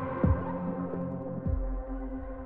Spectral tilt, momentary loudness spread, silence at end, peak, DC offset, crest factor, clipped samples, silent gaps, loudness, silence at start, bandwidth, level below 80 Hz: -12.5 dB/octave; 10 LU; 0 s; -14 dBFS; under 0.1%; 18 dB; under 0.1%; none; -33 LUFS; 0 s; 3.6 kHz; -38 dBFS